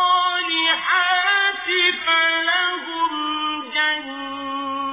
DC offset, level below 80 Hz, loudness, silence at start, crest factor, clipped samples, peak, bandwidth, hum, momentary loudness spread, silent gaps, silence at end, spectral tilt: under 0.1%; -70 dBFS; -19 LUFS; 0 s; 14 dB; under 0.1%; -6 dBFS; 3.9 kHz; none; 9 LU; none; 0 s; -4 dB/octave